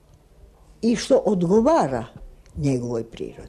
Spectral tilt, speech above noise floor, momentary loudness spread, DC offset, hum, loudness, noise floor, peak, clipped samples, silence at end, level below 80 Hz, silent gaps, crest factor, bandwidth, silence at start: -6.5 dB/octave; 30 dB; 15 LU; under 0.1%; none; -21 LUFS; -51 dBFS; -8 dBFS; under 0.1%; 0 s; -46 dBFS; none; 16 dB; 12 kHz; 0.8 s